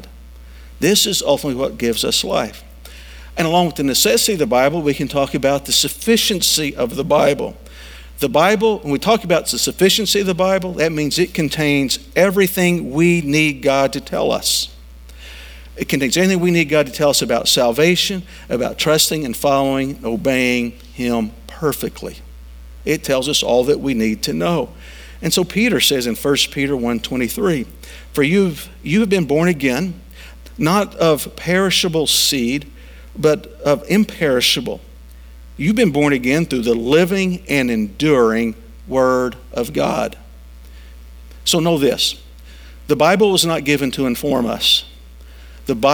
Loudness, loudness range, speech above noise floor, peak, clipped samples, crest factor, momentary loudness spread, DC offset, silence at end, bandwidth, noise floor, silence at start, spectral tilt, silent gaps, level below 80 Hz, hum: -16 LUFS; 4 LU; 22 dB; 0 dBFS; under 0.1%; 18 dB; 12 LU; under 0.1%; 0 s; over 20 kHz; -38 dBFS; 0 s; -4 dB/octave; none; -40 dBFS; none